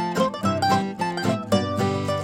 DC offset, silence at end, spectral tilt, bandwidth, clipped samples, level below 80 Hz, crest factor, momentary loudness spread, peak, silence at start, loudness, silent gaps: under 0.1%; 0 s; -5.5 dB/octave; 16.5 kHz; under 0.1%; -62 dBFS; 16 dB; 4 LU; -6 dBFS; 0 s; -23 LUFS; none